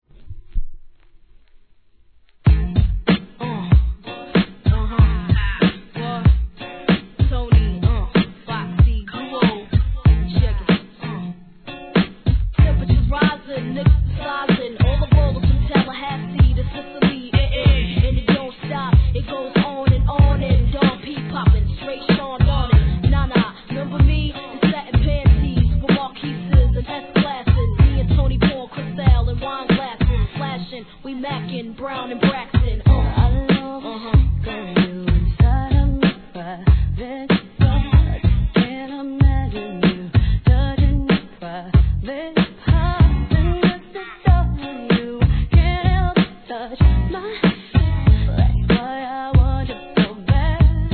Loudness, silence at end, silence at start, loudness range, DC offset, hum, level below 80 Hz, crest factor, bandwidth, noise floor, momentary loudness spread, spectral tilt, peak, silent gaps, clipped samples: -19 LUFS; 0 s; 0.2 s; 2 LU; 0.2%; none; -20 dBFS; 16 dB; 4.5 kHz; -54 dBFS; 11 LU; -11 dB/octave; -2 dBFS; none; under 0.1%